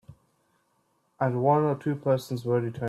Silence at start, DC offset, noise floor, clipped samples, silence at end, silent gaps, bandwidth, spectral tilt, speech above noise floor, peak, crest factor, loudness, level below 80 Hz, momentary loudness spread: 0.1 s; under 0.1%; -71 dBFS; under 0.1%; 0 s; none; 14 kHz; -8 dB/octave; 45 dB; -10 dBFS; 18 dB; -26 LUFS; -66 dBFS; 6 LU